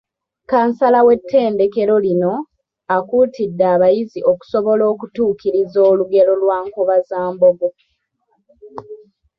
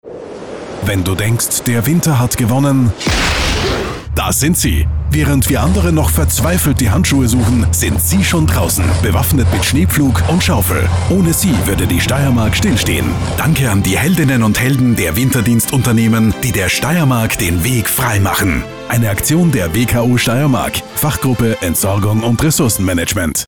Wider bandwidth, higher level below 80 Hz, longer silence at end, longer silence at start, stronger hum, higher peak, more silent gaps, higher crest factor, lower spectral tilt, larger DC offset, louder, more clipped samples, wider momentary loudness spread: second, 6 kHz vs 20 kHz; second, -58 dBFS vs -24 dBFS; first, 0.45 s vs 0 s; first, 0.5 s vs 0.05 s; neither; about the same, -2 dBFS vs -4 dBFS; neither; first, 14 dB vs 8 dB; first, -8.5 dB/octave vs -5 dB/octave; second, under 0.1% vs 0.7%; about the same, -15 LUFS vs -13 LUFS; neither; first, 10 LU vs 4 LU